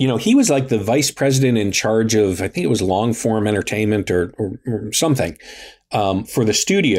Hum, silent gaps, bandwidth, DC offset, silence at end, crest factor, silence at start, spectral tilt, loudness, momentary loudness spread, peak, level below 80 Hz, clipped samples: none; none; 16 kHz; under 0.1%; 0 s; 12 dB; 0 s; -4.5 dB/octave; -18 LUFS; 9 LU; -6 dBFS; -50 dBFS; under 0.1%